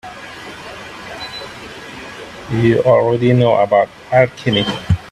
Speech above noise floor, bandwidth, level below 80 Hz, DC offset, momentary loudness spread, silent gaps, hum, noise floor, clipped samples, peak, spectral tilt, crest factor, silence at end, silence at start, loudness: 19 dB; 12.5 kHz; -42 dBFS; under 0.1%; 19 LU; none; none; -32 dBFS; under 0.1%; 0 dBFS; -7 dB/octave; 16 dB; 0 s; 0.05 s; -14 LUFS